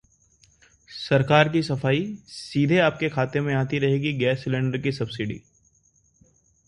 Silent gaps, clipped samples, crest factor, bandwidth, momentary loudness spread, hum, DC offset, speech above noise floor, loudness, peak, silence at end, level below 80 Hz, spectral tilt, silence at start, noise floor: none; under 0.1%; 22 dB; 11 kHz; 14 LU; none; under 0.1%; 40 dB; -23 LUFS; -2 dBFS; 1.3 s; -56 dBFS; -7 dB/octave; 0.9 s; -63 dBFS